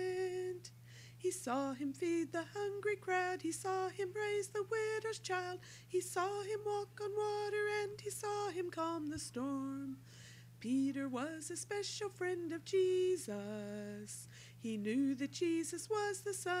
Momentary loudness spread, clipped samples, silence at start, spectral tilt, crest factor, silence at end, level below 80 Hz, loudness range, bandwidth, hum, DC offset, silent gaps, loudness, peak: 10 LU; under 0.1%; 0 s; -4 dB/octave; 14 dB; 0 s; -76 dBFS; 3 LU; 16 kHz; none; under 0.1%; none; -40 LUFS; -24 dBFS